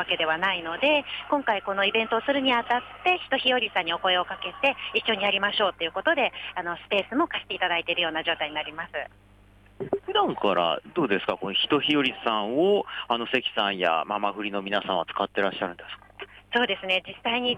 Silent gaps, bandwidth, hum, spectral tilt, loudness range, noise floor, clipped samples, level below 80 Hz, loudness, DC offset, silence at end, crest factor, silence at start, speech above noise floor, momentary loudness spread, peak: none; 11.5 kHz; none; -5.5 dB/octave; 4 LU; -54 dBFS; under 0.1%; -60 dBFS; -25 LUFS; under 0.1%; 0 s; 16 dB; 0 s; 28 dB; 9 LU; -10 dBFS